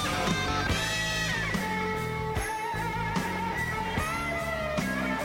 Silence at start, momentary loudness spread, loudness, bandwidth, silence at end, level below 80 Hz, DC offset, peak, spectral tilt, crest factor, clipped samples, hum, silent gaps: 0 s; 4 LU; -29 LUFS; 16.5 kHz; 0 s; -42 dBFS; under 0.1%; -14 dBFS; -4 dB/octave; 16 dB; under 0.1%; none; none